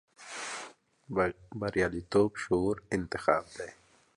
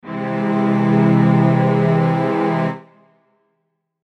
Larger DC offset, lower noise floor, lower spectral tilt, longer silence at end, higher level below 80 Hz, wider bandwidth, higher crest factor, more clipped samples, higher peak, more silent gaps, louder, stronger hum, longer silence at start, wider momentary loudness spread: neither; second, -50 dBFS vs -71 dBFS; second, -5.5 dB/octave vs -9.5 dB/octave; second, 0.45 s vs 1.25 s; first, -56 dBFS vs -70 dBFS; first, 11.5 kHz vs 6.2 kHz; first, 22 dB vs 14 dB; neither; second, -10 dBFS vs -4 dBFS; neither; second, -32 LUFS vs -16 LUFS; neither; first, 0.2 s vs 0.05 s; first, 15 LU vs 9 LU